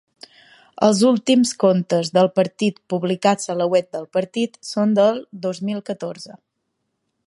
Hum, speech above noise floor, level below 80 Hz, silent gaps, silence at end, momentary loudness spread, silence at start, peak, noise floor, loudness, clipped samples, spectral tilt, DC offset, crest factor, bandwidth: none; 56 dB; -68 dBFS; none; 0.9 s; 11 LU; 0.8 s; -2 dBFS; -75 dBFS; -19 LUFS; under 0.1%; -5.5 dB/octave; under 0.1%; 18 dB; 11.5 kHz